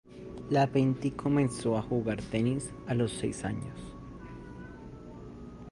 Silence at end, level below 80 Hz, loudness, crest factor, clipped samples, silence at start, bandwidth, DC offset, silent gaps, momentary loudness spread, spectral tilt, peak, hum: 0 s; -52 dBFS; -31 LUFS; 18 dB; under 0.1%; 0.05 s; 11.5 kHz; under 0.1%; none; 19 LU; -6.5 dB/octave; -14 dBFS; none